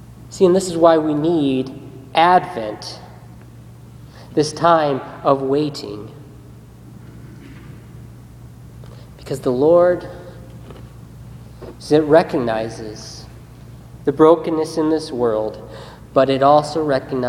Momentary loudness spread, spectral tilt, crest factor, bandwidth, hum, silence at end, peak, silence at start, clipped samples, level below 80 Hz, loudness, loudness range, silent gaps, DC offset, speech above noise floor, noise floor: 25 LU; -6 dB/octave; 20 dB; 14.5 kHz; none; 0 s; 0 dBFS; 0.1 s; under 0.1%; -48 dBFS; -17 LUFS; 8 LU; none; under 0.1%; 24 dB; -40 dBFS